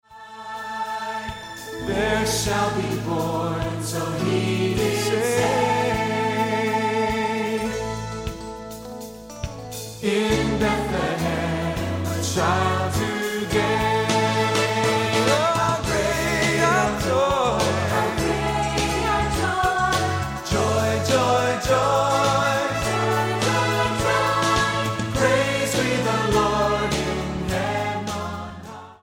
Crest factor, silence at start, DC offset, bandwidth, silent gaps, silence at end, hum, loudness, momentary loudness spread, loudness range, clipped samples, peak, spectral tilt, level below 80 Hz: 16 dB; 0.1 s; under 0.1%; 16.5 kHz; none; 0.1 s; none; -22 LUFS; 12 LU; 5 LU; under 0.1%; -6 dBFS; -4.5 dB/octave; -40 dBFS